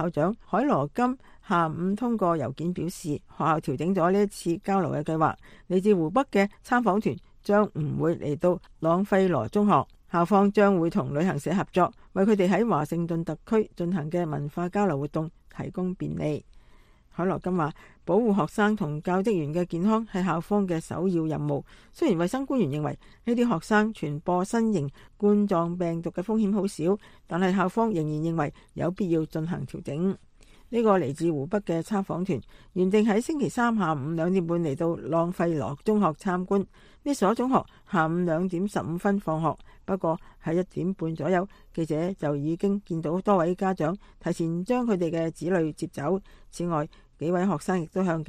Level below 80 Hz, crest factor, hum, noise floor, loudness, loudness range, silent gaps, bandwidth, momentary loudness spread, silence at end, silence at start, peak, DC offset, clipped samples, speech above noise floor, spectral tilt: -54 dBFS; 18 dB; none; -55 dBFS; -27 LUFS; 5 LU; none; 13.5 kHz; 8 LU; 0.05 s; 0 s; -8 dBFS; under 0.1%; under 0.1%; 29 dB; -7.5 dB/octave